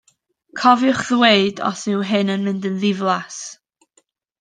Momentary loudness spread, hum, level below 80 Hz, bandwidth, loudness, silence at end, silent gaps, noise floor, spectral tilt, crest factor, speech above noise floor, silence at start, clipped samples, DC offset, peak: 16 LU; none; -64 dBFS; 9.6 kHz; -18 LUFS; 0.9 s; none; -62 dBFS; -4.5 dB/octave; 18 dB; 45 dB; 0.55 s; under 0.1%; under 0.1%; 0 dBFS